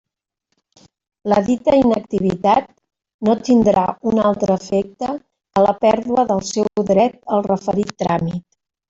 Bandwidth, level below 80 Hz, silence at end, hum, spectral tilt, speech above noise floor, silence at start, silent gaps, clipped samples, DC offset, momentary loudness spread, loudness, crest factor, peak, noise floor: 8 kHz; -50 dBFS; 0.5 s; none; -6.5 dB/octave; 58 dB; 1.25 s; 3.14-3.19 s; under 0.1%; under 0.1%; 8 LU; -17 LUFS; 16 dB; -2 dBFS; -74 dBFS